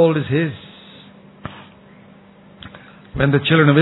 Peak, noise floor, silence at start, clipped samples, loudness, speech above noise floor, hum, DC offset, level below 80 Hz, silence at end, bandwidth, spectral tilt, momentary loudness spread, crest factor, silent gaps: -2 dBFS; -45 dBFS; 0 s; under 0.1%; -17 LUFS; 31 dB; none; under 0.1%; -46 dBFS; 0 s; 4.1 kHz; -10.5 dB/octave; 27 LU; 18 dB; none